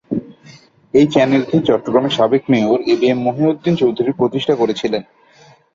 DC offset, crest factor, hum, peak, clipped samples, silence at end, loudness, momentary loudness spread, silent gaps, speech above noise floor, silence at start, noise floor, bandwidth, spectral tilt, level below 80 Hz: under 0.1%; 14 dB; none; -2 dBFS; under 0.1%; 0.75 s; -16 LUFS; 6 LU; none; 33 dB; 0.1 s; -48 dBFS; 7.6 kHz; -7 dB/octave; -54 dBFS